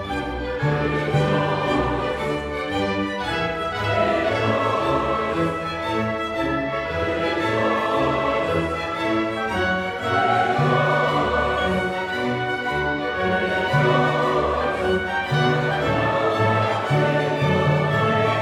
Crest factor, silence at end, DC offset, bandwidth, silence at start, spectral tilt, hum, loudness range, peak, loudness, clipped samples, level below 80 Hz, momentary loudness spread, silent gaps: 14 dB; 0 s; under 0.1%; 12.5 kHz; 0 s; -6.5 dB/octave; none; 2 LU; -6 dBFS; -21 LUFS; under 0.1%; -42 dBFS; 5 LU; none